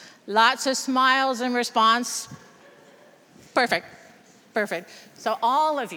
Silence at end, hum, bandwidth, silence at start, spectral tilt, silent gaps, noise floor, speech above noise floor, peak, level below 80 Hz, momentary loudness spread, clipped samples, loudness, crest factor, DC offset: 0 s; none; over 20 kHz; 0 s; -2 dB/octave; none; -53 dBFS; 30 dB; -4 dBFS; -78 dBFS; 11 LU; under 0.1%; -23 LUFS; 20 dB; under 0.1%